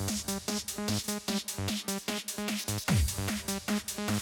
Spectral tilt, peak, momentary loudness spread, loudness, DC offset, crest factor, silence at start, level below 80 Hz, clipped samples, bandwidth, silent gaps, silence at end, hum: -3.5 dB/octave; -16 dBFS; 5 LU; -32 LUFS; under 0.1%; 16 dB; 0 s; -44 dBFS; under 0.1%; over 20 kHz; none; 0 s; none